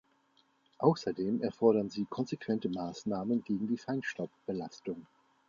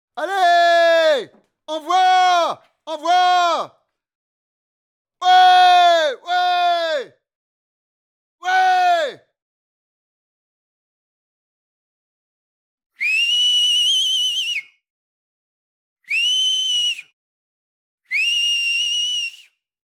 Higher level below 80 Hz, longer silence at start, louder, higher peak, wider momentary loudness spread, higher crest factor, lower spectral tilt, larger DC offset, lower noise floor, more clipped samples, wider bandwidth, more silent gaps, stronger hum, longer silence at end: first, -72 dBFS vs -90 dBFS; first, 0.8 s vs 0.15 s; second, -34 LUFS vs -16 LUFS; second, -12 dBFS vs -2 dBFS; about the same, 12 LU vs 13 LU; first, 22 dB vs 16 dB; first, -7 dB/octave vs 1.5 dB/octave; neither; first, -71 dBFS vs -49 dBFS; neither; second, 7.4 kHz vs 13.5 kHz; second, none vs 4.15-5.05 s, 7.35-8.38 s, 9.42-12.78 s, 12.86-12.90 s, 14.90-15.96 s, 17.13-17.98 s; neither; second, 0.45 s vs 0.65 s